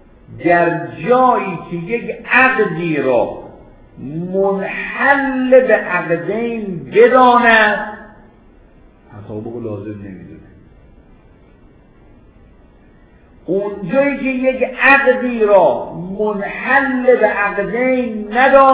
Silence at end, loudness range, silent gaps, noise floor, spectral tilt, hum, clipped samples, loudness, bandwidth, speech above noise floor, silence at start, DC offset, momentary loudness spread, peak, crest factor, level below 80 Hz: 0 s; 19 LU; none; -46 dBFS; -9 dB/octave; none; under 0.1%; -14 LUFS; 4 kHz; 32 dB; 0.3 s; under 0.1%; 17 LU; 0 dBFS; 16 dB; -48 dBFS